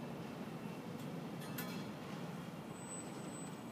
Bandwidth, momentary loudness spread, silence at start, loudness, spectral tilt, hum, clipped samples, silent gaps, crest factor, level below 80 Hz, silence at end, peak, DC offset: 15.5 kHz; 3 LU; 0 s; -47 LUFS; -5 dB/octave; none; under 0.1%; none; 16 dB; -76 dBFS; 0 s; -30 dBFS; under 0.1%